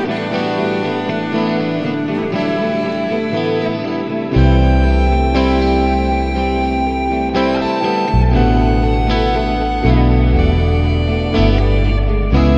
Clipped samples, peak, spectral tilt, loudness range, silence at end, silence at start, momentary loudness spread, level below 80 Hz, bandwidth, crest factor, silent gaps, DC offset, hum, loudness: under 0.1%; 0 dBFS; -8 dB/octave; 4 LU; 0 s; 0 s; 6 LU; -18 dBFS; 7.6 kHz; 14 dB; none; under 0.1%; none; -16 LUFS